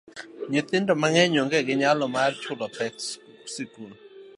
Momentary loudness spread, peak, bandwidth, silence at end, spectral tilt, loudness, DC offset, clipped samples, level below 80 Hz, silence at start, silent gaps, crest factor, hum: 18 LU; -4 dBFS; 11.5 kHz; 0.1 s; -4 dB/octave; -24 LUFS; under 0.1%; under 0.1%; -74 dBFS; 0.15 s; none; 22 dB; none